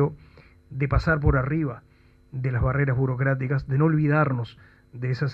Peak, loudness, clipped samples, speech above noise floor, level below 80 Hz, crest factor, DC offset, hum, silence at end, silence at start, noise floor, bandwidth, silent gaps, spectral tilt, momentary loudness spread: -8 dBFS; -24 LUFS; under 0.1%; 29 dB; -36 dBFS; 16 dB; under 0.1%; none; 0 s; 0 s; -52 dBFS; 5.8 kHz; none; -9.5 dB/octave; 12 LU